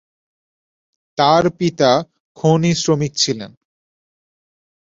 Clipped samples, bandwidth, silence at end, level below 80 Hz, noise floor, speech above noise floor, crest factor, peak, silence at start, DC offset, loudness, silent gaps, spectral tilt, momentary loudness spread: under 0.1%; 7.8 kHz; 1.4 s; -56 dBFS; under -90 dBFS; over 74 dB; 18 dB; -2 dBFS; 1.2 s; under 0.1%; -16 LUFS; 2.20-2.35 s; -5 dB/octave; 14 LU